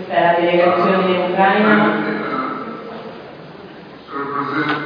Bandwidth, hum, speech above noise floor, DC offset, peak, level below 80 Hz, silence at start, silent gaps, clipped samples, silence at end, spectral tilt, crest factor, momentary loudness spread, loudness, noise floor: 5.2 kHz; none; 23 dB; under 0.1%; -2 dBFS; -64 dBFS; 0 s; none; under 0.1%; 0 s; -8.5 dB/octave; 16 dB; 23 LU; -16 LUFS; -36 dBFS